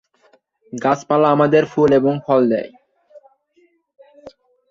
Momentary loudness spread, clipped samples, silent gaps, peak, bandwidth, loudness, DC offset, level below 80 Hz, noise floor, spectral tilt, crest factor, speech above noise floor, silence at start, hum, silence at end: 9 LU; under 0.1%; none; -2 dBFS; 7.6 kHz; -16 LUFS; under 0.1%; -58 dBFS; -59 dBFS; -7 dB/octave; 18 dB; 44 dB; 0.75 s; none; 0.4 s